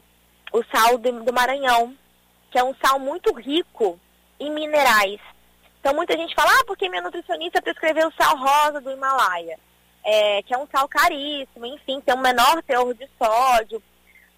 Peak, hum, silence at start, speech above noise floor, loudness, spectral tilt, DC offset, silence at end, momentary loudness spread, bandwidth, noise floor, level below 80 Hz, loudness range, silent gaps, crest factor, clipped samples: -6 dBFS; 60 Hz at -60 dBFS; 0.55 s; 38 dB; -20 LUFS; -1.5 dB/octave; under 0.1%; 0.6 s; 13 LU; 16 kHz; -59 dBFS; -54 dBFS; 2 LU; none; 16 dB; under 0.1%